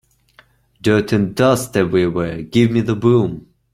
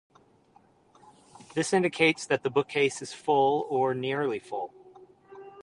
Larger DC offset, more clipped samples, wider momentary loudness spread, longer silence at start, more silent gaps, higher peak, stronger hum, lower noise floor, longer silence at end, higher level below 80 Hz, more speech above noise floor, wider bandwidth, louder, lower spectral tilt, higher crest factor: neither; neither; second, 7 LU vs 12 LU; second, 0.85 s vs 1.5 s; neither; first, -2 dBFS vs -10 dBFS; neither; second, -52 dBFS vs -62 dBFS; first, 0.35 s vs 0.05 s; first, -48 dBFS vs -72 dBFS; about the same, 37 dB vs 35 dB; first, 15.5 kHz vs 11 kHz; first, -17 LUFS vs -27 LUFS; first, -6.5 dB/octave vs -4.5 dB/octave; about the same, 16 dB vs 20 dB